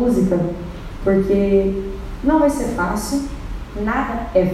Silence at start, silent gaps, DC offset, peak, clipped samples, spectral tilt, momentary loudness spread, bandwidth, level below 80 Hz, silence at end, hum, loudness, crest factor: 0 s; none; under 0.1%; -4 dBFS; under 0.1%; -7 dB/octave; 14 LU; 14.5 kHz; -30 dBFS; 0 s; none; -19 LUFS; 14 dB